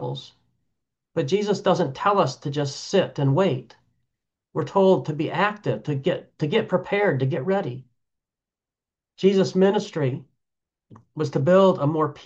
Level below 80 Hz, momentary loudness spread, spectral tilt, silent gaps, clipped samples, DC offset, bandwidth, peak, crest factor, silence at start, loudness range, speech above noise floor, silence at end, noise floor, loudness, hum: -68 dBFS; 12 LU; -6.5 dB/octave; none; under 0.1%; under 0.1%; 8 kHz; -6 dBFS; 18 dB; 0 s; 3 LU; 68 dB; 0.05 s; -90 dBFS; -23 LUFS; none